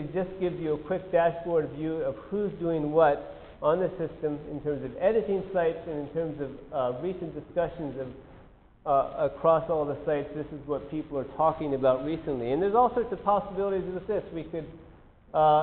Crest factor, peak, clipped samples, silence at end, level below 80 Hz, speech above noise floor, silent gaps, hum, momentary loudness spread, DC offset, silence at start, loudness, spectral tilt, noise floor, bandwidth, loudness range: 20 dB; -10 dBFS; under 0.1%; 0 s; -54 dBFS; 26 dB; none; none; 12 LU; under 0.1%; 0 s; -29 LUFS; -6 dB/octave; -54 dBFS; 4.3 kHz; 4 LU